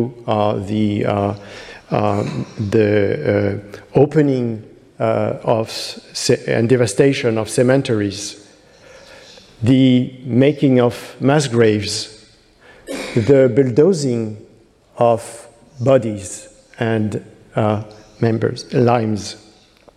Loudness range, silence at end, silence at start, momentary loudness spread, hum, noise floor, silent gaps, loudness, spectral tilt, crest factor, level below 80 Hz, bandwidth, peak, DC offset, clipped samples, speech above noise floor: 4 LU; 0.6 s; 0 s; 14 LU; none; -50 dBFS; none; -17 LUFS; -6 dB/octave; 16 dB; -54 dBFS; 14 kHz; 0 dBFS; under 0.1%; under 0.1%; 33 dB